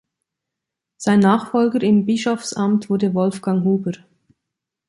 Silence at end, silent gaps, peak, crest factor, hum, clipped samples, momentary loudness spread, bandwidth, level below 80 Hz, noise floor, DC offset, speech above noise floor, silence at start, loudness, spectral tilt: 0.95 s; none; -2 dBFS; 18 dB; none; under 0.1%; 7 LU; 11.5 kHz; -62 dBFS; -83 dBFS; under 0.1%; 66 dB; 1 s; -18 LUFS; -6.5 dB/octave